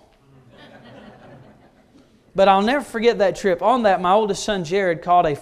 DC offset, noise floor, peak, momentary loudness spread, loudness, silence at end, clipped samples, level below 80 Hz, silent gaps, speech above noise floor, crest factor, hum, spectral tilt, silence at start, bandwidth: under 0.1%; -53 dBFS; -2 dBFS; 6 LU; -18 LUFS; 0 s; under 0.1%; -50 dBFS; none; 35 dB; 18 dB; none; -5 dB/octave; 1.05 s; 13.5 kHz